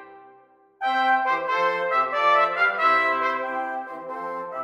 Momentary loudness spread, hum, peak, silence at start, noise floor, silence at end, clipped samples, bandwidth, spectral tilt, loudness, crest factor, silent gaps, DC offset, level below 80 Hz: 12 LU; none; -8 dBFS; 0 s; -55 dBFS; 0 s; under 0.1%; 14 kHz; -3.5 dB/octave; -22 LUFS; 16 dB; none; under 0.1%; -78 dBFS